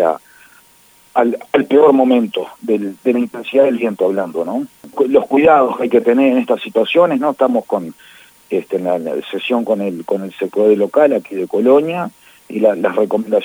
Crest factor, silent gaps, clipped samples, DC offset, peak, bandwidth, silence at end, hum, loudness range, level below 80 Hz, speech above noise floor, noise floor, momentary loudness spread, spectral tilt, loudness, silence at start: 14 dB; none; under 0.1%; under 0.1%; 0 dBFS; over 20 kHz; 0 s; none; 4 LU; -62 dBFS; 35 dB; -49 dBFS; 11 LU; -6.5 dB/octave; -15 LUFS; 0 s